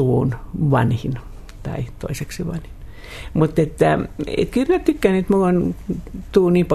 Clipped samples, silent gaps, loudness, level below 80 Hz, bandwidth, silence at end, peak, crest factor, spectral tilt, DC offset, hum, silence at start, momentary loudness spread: under 0.1%; none; -20 LUFS; -36 dBFS; 13.5 kHz; 0 s; -2 dBFS; 18 dB; -7.5 dB/octave; under 0.1%; none; 0 s; 15 LU